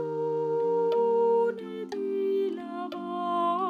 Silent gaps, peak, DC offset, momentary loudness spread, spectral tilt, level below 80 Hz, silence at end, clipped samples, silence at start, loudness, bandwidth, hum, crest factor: none; -18 dBFS; under 0.1%; 11 LU; -7.5 dB/octave; -86 dBFS; 0 s; under 0.1%; 0 s; -28 LUFS; 6.4 kHz; none; 10 dB